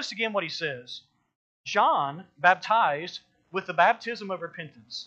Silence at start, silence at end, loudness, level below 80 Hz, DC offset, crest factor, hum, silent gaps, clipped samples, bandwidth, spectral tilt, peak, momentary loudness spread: 0 s; 0 s; -26 LUFS; -80 dBFS; under 0.1%; 22 dB; none; 1.35-1.64 s; under 0.1%; 8.2 kHz; -3.5 dB/octave; -6 dBFS; 18 LU